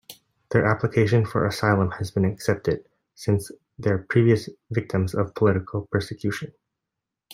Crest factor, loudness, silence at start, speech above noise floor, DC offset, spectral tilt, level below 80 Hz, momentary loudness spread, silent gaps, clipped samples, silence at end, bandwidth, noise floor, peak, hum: 20 dB; -24 LUFS; 0.1 s; 62 dB; under 0.1%; -7 dB/octave; -56 dBFS; 9 LU; none; under 0.1%; 0 s; 16 kHz; -85 dBFS; -4 dBFS; none